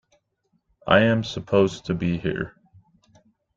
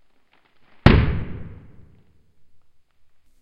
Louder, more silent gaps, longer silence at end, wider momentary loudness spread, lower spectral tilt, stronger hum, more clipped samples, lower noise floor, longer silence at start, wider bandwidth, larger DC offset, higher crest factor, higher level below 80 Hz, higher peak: second, -22 LUFS vs -19 LUFS; neither; second, 1.05 s vs 1.9 s; second, 14 LU vs 23 LU; second, -6.5 dB/octave vs -8.5 dB/octave; neither; neither; first, -71 dBFS vs -57 dBFS; about the same, 0.85 s vs 0.85 s; first, 7.8 kHz vs 7 kHz; neither; about the same, 22 dB vs 24 dB; second, -52 dBFS vs -30 dBFS; second, -4 dBFS vs 0 dBFS